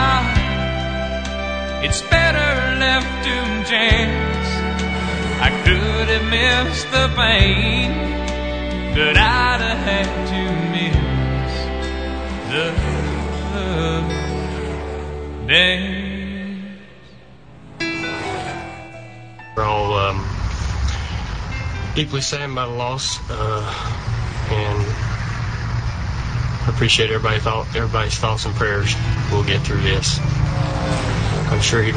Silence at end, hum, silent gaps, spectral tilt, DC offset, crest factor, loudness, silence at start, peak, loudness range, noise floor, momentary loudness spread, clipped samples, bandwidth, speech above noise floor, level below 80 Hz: 0 s; none; none; -4.5 dB/octave; 0.4%; 20 dB; -19 LUFS; 0 s; 0 dBFS; 7 LU; -43 dBFS; 11 LU; under 0.1%; 9.6 kHz; 26 dB; -26 dBFS